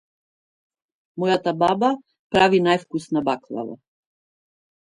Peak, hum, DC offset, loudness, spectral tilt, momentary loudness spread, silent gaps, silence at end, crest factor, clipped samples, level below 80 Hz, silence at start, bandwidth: -2 dBFS; none; under 0.1%; -21 LUFS; -6 dB/octave; 15 LU; 2.19-2.30 s; 1.2 s; 20 dB; under 0.1%; -60 dBFS; 1.15 s; 11 kHz